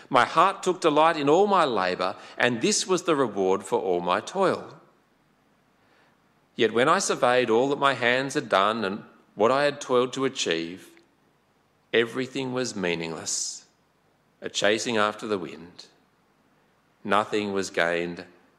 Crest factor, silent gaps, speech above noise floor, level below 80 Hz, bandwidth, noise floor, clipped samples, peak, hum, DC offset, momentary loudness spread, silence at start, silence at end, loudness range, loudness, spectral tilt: 20 dB; none; 41 dB; -72 dBFS; 13.5 kHz; -65 dBFS; under 0.1%; -6 dBFS; none; under 0.1%; 11 LU; 0.1 s; 0.35 s; 7 LU; -24 LUFS; -3.5 dB/octave